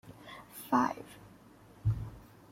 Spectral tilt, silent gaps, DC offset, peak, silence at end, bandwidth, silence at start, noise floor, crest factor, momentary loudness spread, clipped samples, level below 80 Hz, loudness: -7 dB/octave; none; under 0.1%; -14 dBFS; 0.25 s; 16.5 kHz; 0.05 s; -57 dBFS; 22 dB; 22 LU; under 0.1%; -52 dBFS; -34 LUFS